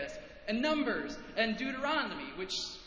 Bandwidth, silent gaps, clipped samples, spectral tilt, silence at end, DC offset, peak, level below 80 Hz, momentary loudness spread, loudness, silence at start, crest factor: 8 kHz; none; under 0.1%; -3.5 dB/octave; 0 s; under 0.1%; -18 dBFS; -60 dBFS; 9 LU; -34 LUFS; 0 s; 18 dB